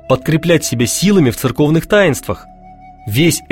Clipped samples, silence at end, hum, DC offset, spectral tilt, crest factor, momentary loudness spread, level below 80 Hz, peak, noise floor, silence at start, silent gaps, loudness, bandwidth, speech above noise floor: under 0.1%; 0.05 s; none; under 0.1%; -5 dB/octave; 14 dB; 11 LU; -40 dBFS; 0 dBFS; -38 dBFS; 0.05 s; none; -13 LUFS; 17 kHz; 25 dB